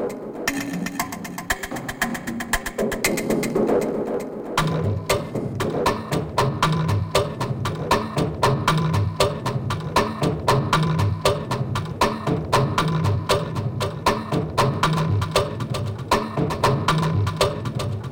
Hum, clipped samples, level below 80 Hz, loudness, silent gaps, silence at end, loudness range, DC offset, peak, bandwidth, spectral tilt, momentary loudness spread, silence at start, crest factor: none; under 0.1%; -40 dBFS; -23 LUFS; none; 0 s; 2 LU; under 0.1%; -4 dBFS; 17 kHz; -5.5 dB/octave; 7 LU; 0 s; 18 dB